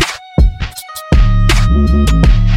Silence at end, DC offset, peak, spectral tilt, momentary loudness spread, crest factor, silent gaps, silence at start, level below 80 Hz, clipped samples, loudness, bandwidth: 0 s; under 0.1%; 0 dBFS; -5.5 dB/octave; 12 LU; 10 dB; none; 0 s; -12 dBFS; under 0.1%; -12 LUFS; 16 kHz